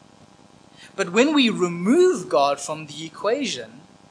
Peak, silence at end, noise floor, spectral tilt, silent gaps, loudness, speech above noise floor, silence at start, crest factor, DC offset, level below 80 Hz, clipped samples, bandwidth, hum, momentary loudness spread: -4 dBFS; 0.4 s; -51 dBFS; -4.5 dB/octave; none; -21 LUFS; 30 dB; 0.8 s; 18 dB; under 0.1%; -72 dBFS; under 0.1%; 10.5 kHz; none; 14 LU